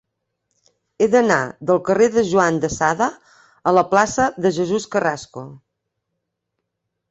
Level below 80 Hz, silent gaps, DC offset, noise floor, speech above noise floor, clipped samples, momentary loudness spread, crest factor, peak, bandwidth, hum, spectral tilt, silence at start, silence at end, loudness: -52 dBFS; none; under 0.1%; -78 dBFS; 60 dB; under 0.1%; 8 LU; 18 dB; -2 dBFS; 8.2 kHz; none; -5 dB/octave; 1 s; 1.55 s; -18 LUFS